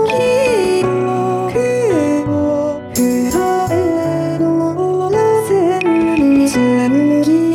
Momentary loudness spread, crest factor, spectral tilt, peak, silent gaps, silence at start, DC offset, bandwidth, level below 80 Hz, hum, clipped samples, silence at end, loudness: 4 LU; 10 dB; -6 dB/octave; -4 dBFS; none; 0 s; under 0.1%; 17 kHz; -44 dBFS; none; under 0.1%; 0 s; -14 LUFS